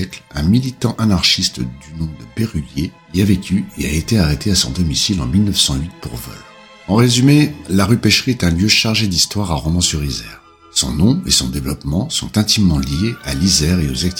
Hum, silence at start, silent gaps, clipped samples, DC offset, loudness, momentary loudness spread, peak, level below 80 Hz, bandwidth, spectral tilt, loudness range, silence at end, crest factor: none; 0 s; none; under 0.1%; under 0.1%; -15 LUFS; 13 LU; 0 dBFS; -30 dBFS; 18 kHz; -4 dB/octave; 4 LU; 0 s; 16 dB